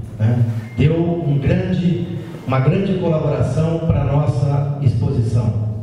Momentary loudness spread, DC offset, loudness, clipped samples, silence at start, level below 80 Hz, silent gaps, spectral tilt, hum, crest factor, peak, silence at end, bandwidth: 4 LU; under 0.1%; -18 LUFS; under 0.1%; 0 s; -36 dBFS; none; -9 dB/octave; none; 14 dB; -2 dBFS; 0 s; 10 kHz